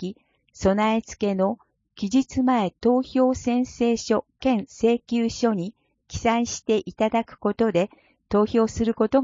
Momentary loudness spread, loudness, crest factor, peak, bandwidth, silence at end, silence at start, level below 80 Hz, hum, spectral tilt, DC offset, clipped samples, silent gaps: 5 LU; -23 LUFS; 16 dB; -6 dBFS; 7.6 kHz; 0 s; 0 s; -48 dBFS; none; -5.5 dB/octave; under 0.1%; under 0.1%; none